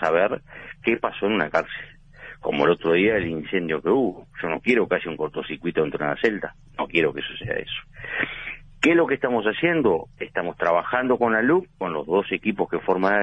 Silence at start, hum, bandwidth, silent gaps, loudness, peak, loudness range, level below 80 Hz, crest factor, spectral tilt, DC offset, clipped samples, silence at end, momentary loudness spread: 0 s; none; 8.4 kHz; none; -23 LUFS; -6 dBFS; 3 LU; -52 dBFS; 18 dB; -6.5 dB/octave; under 0.1%; under 0.1%; 0 s; 12 LU